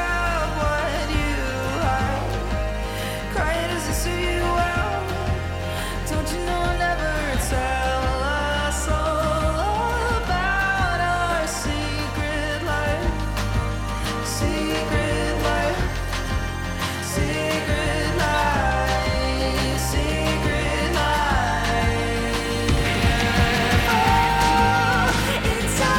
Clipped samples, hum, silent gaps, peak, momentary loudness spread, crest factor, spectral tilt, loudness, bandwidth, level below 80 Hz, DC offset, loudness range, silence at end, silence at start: under 0.1%; none; none; -8 dBFS; 7 LU; 14 dB; -4.5 dB/octave; -22 LUFS; 17.5 kHz; -28 dBFS; under 0.1%; 5 LU; 0 s; 0 s